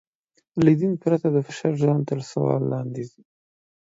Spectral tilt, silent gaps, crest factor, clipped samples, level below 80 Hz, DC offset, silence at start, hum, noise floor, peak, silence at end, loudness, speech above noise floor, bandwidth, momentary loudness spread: -8.5 dB/octave; none; 20 dB; under 0.1%; -62 dBFS; under 0.1%; 0.55 s; none; -70 dBFS; -4 dBFS; 0.8 s; -23 LUFS; 48 dB; 7.8 kHz; 13 LU